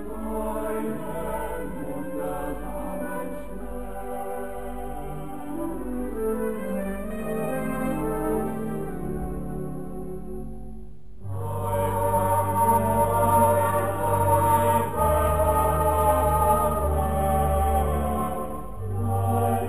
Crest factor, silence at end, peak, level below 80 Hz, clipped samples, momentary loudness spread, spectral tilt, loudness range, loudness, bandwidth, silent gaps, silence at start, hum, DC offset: 16 dB; 0 s; -8 dBFS; -36 dBFS; under 0.1%; 14 LU; -7 dB/octave; 11 LU; -26 LUFS; 15 kHz; none; 0 s; none; 2%